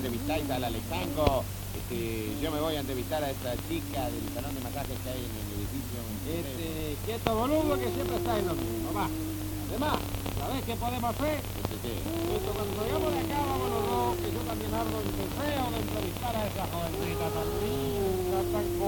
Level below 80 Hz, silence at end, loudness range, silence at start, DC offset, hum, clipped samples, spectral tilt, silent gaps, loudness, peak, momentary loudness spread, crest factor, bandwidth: -42 dBFS; 0 s; 3 LU; 0 s; under 0.1%; none; under 0.1%; -5.5 dB/octave; none; -32 LUFS; -4 dBFS; 6 LU; 26 dB; 19 kHz